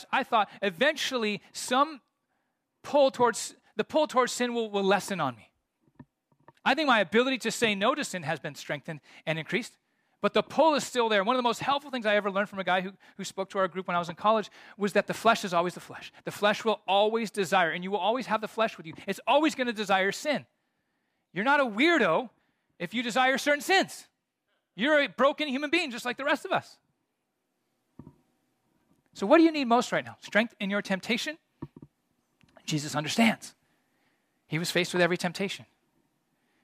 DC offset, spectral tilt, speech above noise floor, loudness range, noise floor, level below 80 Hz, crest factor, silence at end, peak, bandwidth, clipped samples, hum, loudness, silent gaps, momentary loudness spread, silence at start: under 0.1%; -4 dB/octave; 52 dB; 4 LU; -80 dBFS; -76 dBFS; 20 dB; 1 s; -8 dBFS; 15.5 kHz; under 0.1%; none; -27 LUFS; none; 12 LU; 0 s